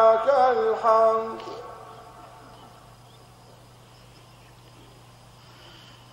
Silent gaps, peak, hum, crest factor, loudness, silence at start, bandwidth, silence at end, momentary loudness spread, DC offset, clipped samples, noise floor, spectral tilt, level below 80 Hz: none; -6 dBFS; 50 Hz at -60 dBFS; 20 dB; -21 LUFS; 0 s; 12.5 kHz; 4.1 s; 27 LU; under 0.1%; under 0.1%; -50 dBFS; -5 dB/octave; -62 dBFS